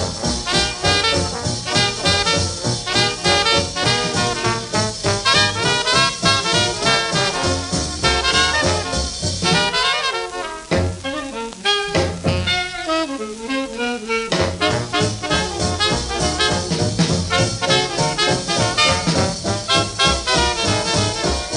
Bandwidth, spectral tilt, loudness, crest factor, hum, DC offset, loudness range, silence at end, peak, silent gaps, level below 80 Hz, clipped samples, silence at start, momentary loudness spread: 11.5 kHz; -3 dB/octave; -18 LUFS; 18 dB; none; under 0.1%; 4 LU; 0 s; 0 dBFS; none; -36 dBFS; under 0.1%; 0 s; 7 LU